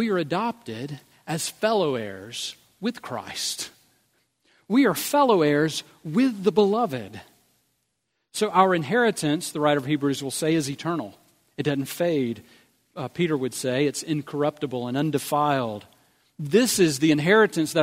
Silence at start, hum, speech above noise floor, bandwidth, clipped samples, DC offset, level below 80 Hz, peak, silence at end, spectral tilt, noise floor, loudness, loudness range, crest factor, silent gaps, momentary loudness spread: 0 s; none; 53 dB; 16 kHz; under 0.1%; under 0.1%; -68 dBFS; -4 dBFS; 0 s; -4.5 dB/octave; -76 dBFS; -24 LUFS; 6 LU; 20 dB; none; 15 LU